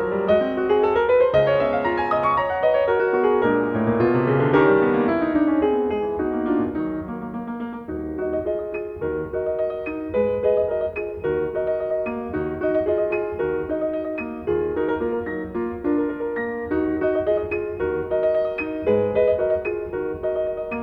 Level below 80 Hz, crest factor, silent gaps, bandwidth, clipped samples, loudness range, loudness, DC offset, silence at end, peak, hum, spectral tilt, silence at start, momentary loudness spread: -46 dBFS; 18 dB; none; 5.4 kHz; under 0.1%; 6 LU; -22 LUFS; under 0.1%; 0 s; -4 dBFS; none; -9 dB/octave; 0 s; 9 LU